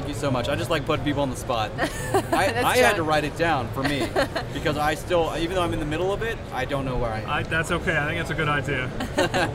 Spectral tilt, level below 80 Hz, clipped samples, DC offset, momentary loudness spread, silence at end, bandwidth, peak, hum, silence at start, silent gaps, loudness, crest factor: -5 dB/octave; -38 dBFS; under 0.1%; under 0.1%; 6 LU; 0 s; 16 kHz; -6 dBFS; none; 0 s; none; -24 LUFS; 18 dB